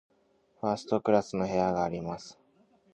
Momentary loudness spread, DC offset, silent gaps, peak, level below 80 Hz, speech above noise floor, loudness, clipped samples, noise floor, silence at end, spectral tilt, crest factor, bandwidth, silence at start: 13 LU; under 0.1%; none; -10 dBFS; -60 dBFS; 39 dB; -30 LUFS; under 0.1%; -68 dBFS; 0.6 s; -6.5 dB/octave; 22 dB; 9.2 kHz; 0.65 s